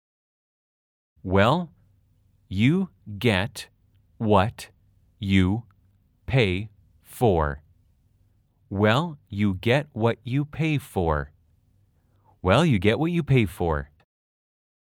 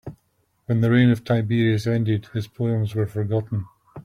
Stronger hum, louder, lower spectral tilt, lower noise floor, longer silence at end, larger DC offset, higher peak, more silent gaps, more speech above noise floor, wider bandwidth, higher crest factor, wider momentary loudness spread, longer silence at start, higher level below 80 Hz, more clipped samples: neither; about the same, -24 LUFS vs -22 LUFS; about the same, -7 dB/octave vs -8 dB/octave; second, -63 dBFS vs -67 dBFS; first, 1.05 s vs 0.05 s; neither; about the same, -4 dBFS vs -4 dBFS; neither; second, 41 dB vs 47 dB; first, 18 kHz vs 11.5 kHz; about the same, 22 dB vs 18 dB; first, 18 LU vs 13 LU; first, 1.25 s vs 0.05 s; first, -48 dBFS vs -56 dBFS; neither